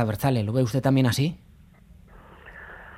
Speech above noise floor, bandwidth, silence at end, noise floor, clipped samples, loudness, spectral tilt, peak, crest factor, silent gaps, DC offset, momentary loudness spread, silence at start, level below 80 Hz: 29 dB; 16 kHz; 0 s; -52 dBFS; under 0.1%; -23 LUFS; -6.5 dB/octave; -8 dBFS; 18 dB; none; under 0.1%; 23 LU; 0 s; -52 dBFS